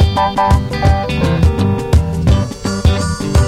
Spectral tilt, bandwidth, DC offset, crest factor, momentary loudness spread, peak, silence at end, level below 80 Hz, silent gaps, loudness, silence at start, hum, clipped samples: -6.5 dB/octave; 13 kHz; under 0.1%; 12 dB; 3 LU; -2 dBFS; 0 s; -18 dBFS; none; -14 LUFS; 0 s; none; under 0.1%